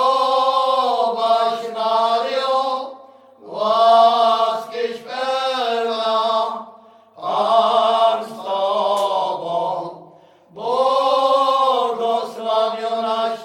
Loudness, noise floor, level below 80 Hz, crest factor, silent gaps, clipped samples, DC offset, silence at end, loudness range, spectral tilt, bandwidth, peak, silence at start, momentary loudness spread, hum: -18 LUFS; -48 dBFS; -78 dBFS; 16 dB; none; under 0.1%; under 0.1%; 0 s; 3 LU; -3 dB/octave; 14.5 kHz; -2 dBFS; 0 s; 10 LU; none